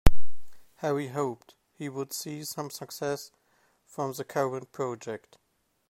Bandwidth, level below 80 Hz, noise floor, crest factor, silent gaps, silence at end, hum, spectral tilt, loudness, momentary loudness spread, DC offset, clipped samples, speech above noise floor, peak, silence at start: 15 kHz; -36 dBFS; -68 dBFS; 22 dB; none; 0 s; none; -5 dB/octave; -34 LUFS; 11 LU; under 0.1%; under 0.1%; 36 dB; -2 dBFS; 0.05 s